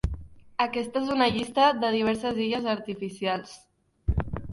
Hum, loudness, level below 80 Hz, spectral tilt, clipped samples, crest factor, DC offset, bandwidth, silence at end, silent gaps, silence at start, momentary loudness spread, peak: none; -27 LUFS; -38 dBFS; -6 dB/octave; under 0.1%; 18 dB; under 0.1%; 11.5 kHz; 0 s; none; 0.05 s; 13 LU; -8 dBFS